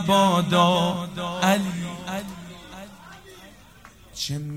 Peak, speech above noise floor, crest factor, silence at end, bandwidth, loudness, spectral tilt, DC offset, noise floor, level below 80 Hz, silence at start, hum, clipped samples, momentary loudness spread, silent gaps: -6 dBFS; 27 dB; 18 dB; 0 s; 16 kHz; -23 LUFS; -5 dB/octave; under 0.1%; -49 dBFS; -54 dBFS; 0 s; none; under 0.1%; 23 LU; none